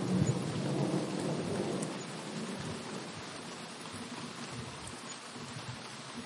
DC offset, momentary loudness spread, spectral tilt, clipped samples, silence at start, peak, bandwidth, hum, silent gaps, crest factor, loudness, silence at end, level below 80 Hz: under 0.1%; 10 LU; -5 dB/octave; under 0.1%; 0 s; -16 dBFS; 11.5 kHz; none; none; 20 dB; -38 LUFS; 0 s; -68 dBFS